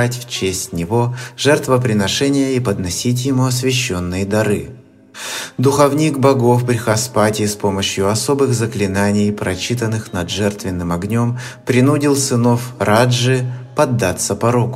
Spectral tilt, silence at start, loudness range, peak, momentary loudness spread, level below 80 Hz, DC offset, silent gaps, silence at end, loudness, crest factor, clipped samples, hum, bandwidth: -5 dB/octave; 0 s; 3 LU; 0 dBFS; 8 LU; -48 dBFS; under 0.1%; none; 0 s; -16 LUFS; 16 dB; under 0.1%; none; 16 kHz